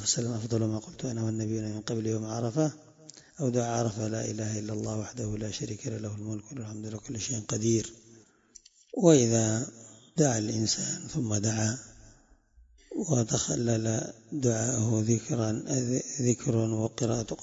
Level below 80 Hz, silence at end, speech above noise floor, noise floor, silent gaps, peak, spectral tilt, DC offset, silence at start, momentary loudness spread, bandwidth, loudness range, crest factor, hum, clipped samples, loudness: -60 dBFS; 0 s; 31 dB; -60 dBFS; none; -8 dBFS; -5 dB/octave; under 0.1%; 0 s; 11 LU; 8 kHz; 7 LU; 22 dB; none; under 0.1%; -30 LUFS